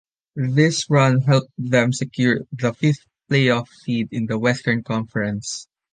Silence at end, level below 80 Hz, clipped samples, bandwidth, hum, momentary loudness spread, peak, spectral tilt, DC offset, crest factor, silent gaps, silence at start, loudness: 0.3 s; -58 dBFS; under 0.1%; 9.6 kHz; none; 10 LU; -2 dBFS; -5.5 dB/octave; under 0.1%; 18 dB; none; 0.35 s; -20 LUFS